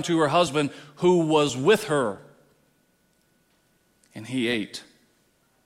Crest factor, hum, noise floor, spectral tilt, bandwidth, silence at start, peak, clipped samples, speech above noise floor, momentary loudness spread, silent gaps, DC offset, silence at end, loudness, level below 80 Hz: 18 dB; none; -66 dBFS; -5 dB/octave; 15.5 kHz; 0 s; -8 dBFS; under 0.1%; 43 dB; 19 LU; none; under 0.1%; 0.85 s; -23 LUFS; -66 dBFS